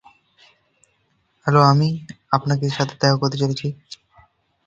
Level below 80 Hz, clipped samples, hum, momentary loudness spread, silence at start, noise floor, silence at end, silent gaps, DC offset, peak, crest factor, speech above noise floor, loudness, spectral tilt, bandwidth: -58 dBFS; under 0.1%; none; 18 LU; 1.45 s; -66 dBFS; 0.7 s; none; under 0.1%; 0 dBFS; 22 dB; 47 dB; -19 LUFS; -6 dB/octave; 7.6 kHz